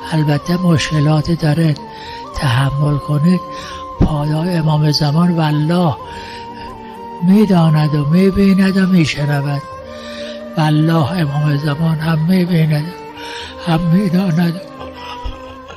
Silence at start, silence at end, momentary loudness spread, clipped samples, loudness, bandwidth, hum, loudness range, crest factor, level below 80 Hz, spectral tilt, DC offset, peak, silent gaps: 0 s; 0 s; 17 LU; under 0.1%; -14 LUFS; 14 kHz; none; 3 LU; 12 dB; -36 dBFS; -7 dB/octave; under 0.1%; -4 dBFS; none